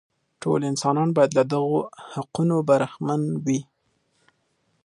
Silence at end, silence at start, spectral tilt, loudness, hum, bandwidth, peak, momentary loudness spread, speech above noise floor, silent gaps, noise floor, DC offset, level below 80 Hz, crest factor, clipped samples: 1.25 s; 0.4 s; -6.5 dB/octave; -23 LUFS; none; 11.5 kHz; -4 dBFS; 10 LU; 47 dB; none; -70 dBFS; under 0.1%; -66 dBFS; 20 dB; under 0.1%